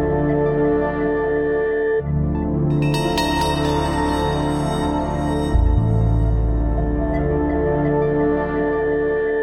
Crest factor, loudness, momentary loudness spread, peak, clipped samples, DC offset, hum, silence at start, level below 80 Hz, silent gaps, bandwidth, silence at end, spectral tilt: 12 dB; -20 LUFS; 3 LU; -6 dBFS; under 0.1%; under 0.1%; none; 0 s; -26 dBFS; none; 16 kHz; 0 s; -7 dB/octave